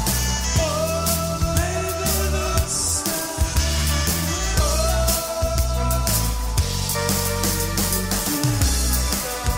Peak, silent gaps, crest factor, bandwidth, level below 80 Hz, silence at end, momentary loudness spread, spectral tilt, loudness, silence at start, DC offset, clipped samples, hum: -4 dBFS; none; 16 dB; 16.5 kHz; -26 dBFS; 0 s; 3 LU; -3.5 dB/octave; -21 LUFS; 0 s; under 0.1%; under 0.1%; none